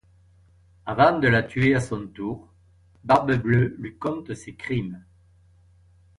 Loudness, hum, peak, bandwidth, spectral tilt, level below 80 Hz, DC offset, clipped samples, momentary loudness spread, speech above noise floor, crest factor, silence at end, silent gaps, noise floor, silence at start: -23 LUFS; none; -4 dBFS; 11 kHz; -7 dB/octave; -52 dBFS; under 0.1%; under 0.1%; 17 LU; 34 dB; 20 dB; 1.2 s; none; -57 dBFS; 0.85 s